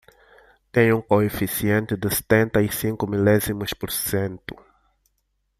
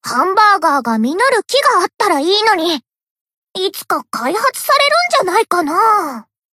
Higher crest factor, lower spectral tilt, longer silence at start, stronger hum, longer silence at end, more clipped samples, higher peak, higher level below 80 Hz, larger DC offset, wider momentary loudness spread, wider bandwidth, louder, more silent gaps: first, 20 dB vs 14 dB; first, -5.5 dB/octave vs -2 dB/octave; first, 0.75 s vs 0.05 s; neither; first, 1.05 s vs 0.3 s; neither; second, -4 dBFS vs 0 dBFS; first, -48 dBFS vs -68 dBFS; neither; second, 7 LU vs 10 LU; about the same, 15.5 kHz vs 16 kHz; second, -22 LUFS vs -13 LUFS; second, none vs 3.10-3.25 s, 3.37-3.42 s